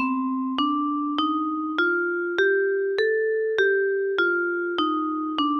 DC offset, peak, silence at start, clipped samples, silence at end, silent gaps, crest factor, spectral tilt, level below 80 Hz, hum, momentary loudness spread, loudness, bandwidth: under 0.1%; -10 dBFS; 0 s; under 0.1%; 0 s; none; 14 dB; -4.5 dB/octave; -66 dBFS; none; 5 LU; -23 LUFS; 6.4 kHz